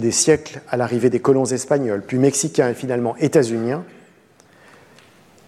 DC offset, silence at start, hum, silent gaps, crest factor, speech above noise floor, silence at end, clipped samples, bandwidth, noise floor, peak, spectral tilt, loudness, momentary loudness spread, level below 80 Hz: under 0.1%; 0 s; none; none; 16 dB; 33 dB; 1.55 s; under 0.1%; 14 kHz; -52 dBFS; -2 dBFS; -4.5 dB/octave; -19 LUFS; 7 LU; -60 dBFS